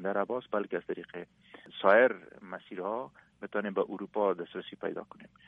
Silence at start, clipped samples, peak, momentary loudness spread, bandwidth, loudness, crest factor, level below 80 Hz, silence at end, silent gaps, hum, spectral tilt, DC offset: 0 s; under 0.1%; -10 dBFS; 22 LU; 4.9 kHz; -31 LUFS; 22 dB; -76 dBFS; 0.2 s; none; none; -8 dB/octave; under 0.1%